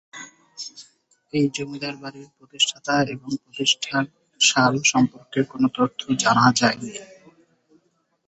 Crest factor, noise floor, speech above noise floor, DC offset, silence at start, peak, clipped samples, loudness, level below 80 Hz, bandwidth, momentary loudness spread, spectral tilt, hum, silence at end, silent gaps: 20 dB; -68 dBFS; 46 dB; under 0.1%; 0.15 s; -2 dBFS; under 0.1%; -21 LUFS; -62 dBFS; 8.4 kHz; 19 LU; -3 dB/octave; none; 1.25 s; none